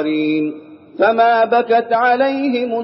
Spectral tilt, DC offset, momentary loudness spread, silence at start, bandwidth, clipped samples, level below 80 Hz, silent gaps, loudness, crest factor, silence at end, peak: -2.5 dB/octave; under 0.1%; 10 LU; 0 s; 5.8 kHz; under 0.1%; -72 dBFS; none; -15 LUFS; 14 dB; 0 s; -2 dBFS